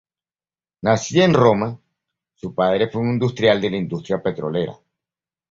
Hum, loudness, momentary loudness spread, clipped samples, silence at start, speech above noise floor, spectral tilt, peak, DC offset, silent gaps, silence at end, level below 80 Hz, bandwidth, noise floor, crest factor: none; -19 LUFS; 13 LU; under 0.1%; 0.85 s; over 72 dB; -6 dB/octave; -2 dBFS; under 0.1%; none; 0.75 s; -54 dBFS; 7.8 kHz; under -90 dBFS; 18 dB